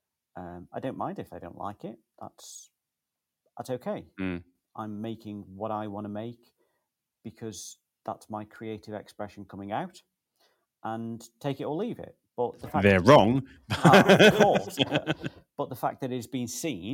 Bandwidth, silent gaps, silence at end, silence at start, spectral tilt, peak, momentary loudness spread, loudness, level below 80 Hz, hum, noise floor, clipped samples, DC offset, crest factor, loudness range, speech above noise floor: 17 kHz; none; 0 s; 0.35 s; -5.5 dB/octave; -2 dBFS; 25 LU; -26 LUFS; -60 dBFS; none; -87 dBFS; under 0.1%; under 0.1%; 26 dB; 19 LU; 60 dB